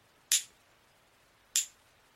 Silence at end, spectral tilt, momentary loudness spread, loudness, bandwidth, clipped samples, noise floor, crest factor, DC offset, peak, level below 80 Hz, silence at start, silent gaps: 0.5 s; 4 dB/octave; 13 LU; -31 LUFS; 16 kHz; under 0.1%; -66 dBFS; 30 dB; under 0.1%; -8 dBFS; -80 dBFS; 0.3 s; none